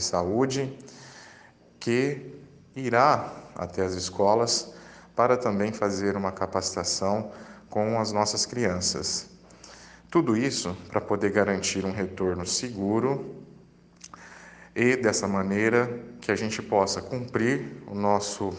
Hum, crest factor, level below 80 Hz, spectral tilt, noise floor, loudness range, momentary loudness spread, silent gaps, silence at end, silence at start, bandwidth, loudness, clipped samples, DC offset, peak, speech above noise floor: none; 22 dB; -62 dBFS; -4 dB/octave; -54 dBFS; 3 LU; 21 LU; none; 0 s; 0 s; 10.5 kHz; -26 LUFS; under 0.1%; under 0.1%; -6 dBFS; 28 dB